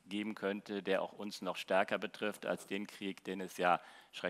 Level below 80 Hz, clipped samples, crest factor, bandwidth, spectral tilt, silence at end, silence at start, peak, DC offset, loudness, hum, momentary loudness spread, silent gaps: -88 dBFS; under 0.1%; 22 dB; 16 kHz; -4.5 dB/octave; 0 s; 0.05 s; -16 dBFS; under 0.1%; -38 LUFS; none; 10 LU; none